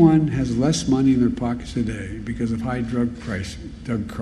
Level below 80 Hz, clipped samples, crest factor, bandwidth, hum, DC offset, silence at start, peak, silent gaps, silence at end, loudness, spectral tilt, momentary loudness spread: -38 dBFS; under 0.1%; 18 dB; 11.5 kHz; none; under 0.1%; 0 s; -2 dBFS; none; 0 s; -22 LUFS; -6.5 dB/octave; 11 LU